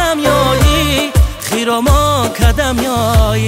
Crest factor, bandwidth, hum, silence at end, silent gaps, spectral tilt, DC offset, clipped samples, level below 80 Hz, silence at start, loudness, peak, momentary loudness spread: 12 dB; 16.5 kHz; none; 0 s; none; -5 dB/octave; under 0.1%; under 0.1%; -16 dBFS; 0 s; -12 LUFS; 0 dBFS; 4 LU